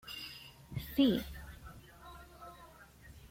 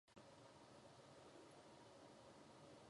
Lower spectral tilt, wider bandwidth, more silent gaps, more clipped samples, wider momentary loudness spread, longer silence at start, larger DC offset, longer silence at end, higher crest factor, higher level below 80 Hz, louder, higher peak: first, -6 dB/octave vs -4.5 dB/octave; first, 16.5 kHz vs 11 kHz; neither; neither; first, 26 LU vs 1 LU; about the same, 0.05 s vs 0.05 s; neither; about the same, 0 s vs 0 s; first, 22 dB vs 16 dB; first, -56 dBFS vs -86 dBFS; first, -35 LUFS vs -65 LUFS; first, -16 dBFS vs -50 dBFS